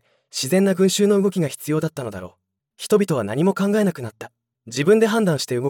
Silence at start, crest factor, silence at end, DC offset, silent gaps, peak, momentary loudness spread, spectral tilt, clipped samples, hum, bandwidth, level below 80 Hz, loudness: 0.35 s; 16 dB; 0 s; under 0.1%; none; -4 dBFS; 17 LU; -5.5 dB/octave; under 0.1%; none; 18 kHz; -68 dBFS; -20 LUFS